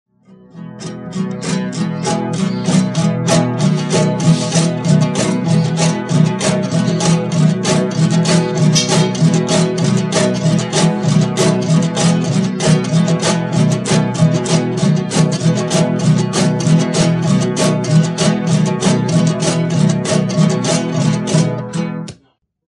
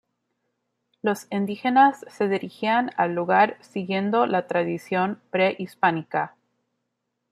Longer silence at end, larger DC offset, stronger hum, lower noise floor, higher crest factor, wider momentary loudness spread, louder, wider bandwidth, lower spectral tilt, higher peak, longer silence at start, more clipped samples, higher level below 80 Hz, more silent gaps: second, 0.6 s vs 1.05 s; neither; neither; second, -56 dBFS vs -79 dBFS; second, 12 dB vs 20 dB; second, 5 LU vs 8 LU; first, -14 LUFS vs -23 LUFS; second, 11.5 kHz vs 14.5 kHz; about the same, -5.5 dB/octave vs -6 dB/octave; about the same, -2 dBFS vs -4 dBFS; second, 0.55 s vs 1.05 s; neither; first, -50 dBFS vs -74 dBFS; neither